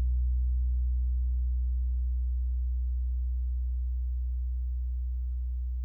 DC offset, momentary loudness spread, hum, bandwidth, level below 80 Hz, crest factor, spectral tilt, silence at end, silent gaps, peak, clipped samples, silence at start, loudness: under 0.1%; 4 LU; none; 0.3 kHz; -30 dBFS; 6 dB; -11 dB/octave; 0 s; none; -22 dBFS; under 0.1%; 0 s; -33 LUFS